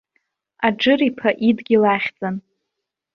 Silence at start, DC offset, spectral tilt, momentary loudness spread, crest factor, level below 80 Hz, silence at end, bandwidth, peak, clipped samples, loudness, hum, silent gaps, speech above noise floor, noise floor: 0.6 s; under 0.1%; -7 dB/octave; 11 LU; 18 dB; -62 dBFS; 0.75 s; 6.6 kHz; -4 dBFS; under 0.1%; -18 LUFS; none; none; 63 dB; -81 dBFS